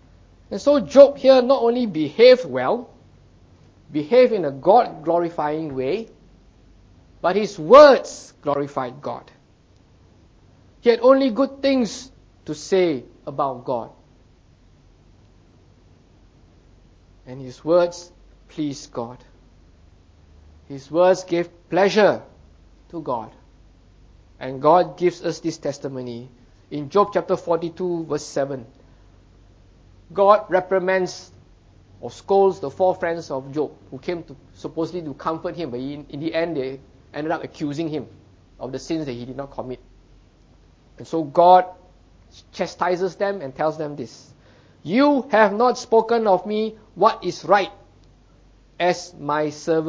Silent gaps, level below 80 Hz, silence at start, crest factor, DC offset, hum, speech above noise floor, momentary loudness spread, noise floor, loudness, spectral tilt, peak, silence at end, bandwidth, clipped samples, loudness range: none; -54 dBFS; 0.5 s; 22 dB; under 0.1%; none; 35 dB; 19 LU; -54 dBFS; -20 LUFS; -5.5 dB/octave; 0 dBFS; 0 s; 7.8 kHz; under 0.1%; 11 LU